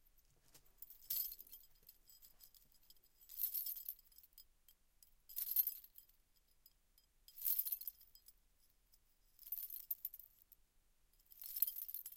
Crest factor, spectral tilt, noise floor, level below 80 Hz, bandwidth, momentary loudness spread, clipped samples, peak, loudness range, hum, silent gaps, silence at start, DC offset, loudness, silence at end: 32 dB; 1.5 dB/octave; -75 dBFS; -76 dBFS; 17 kHz; 26 LU; under 0.1%; -16 dBFS; 7 LU; none; none; 0.15 s; under 0.1%; -42 LUFS; 0 s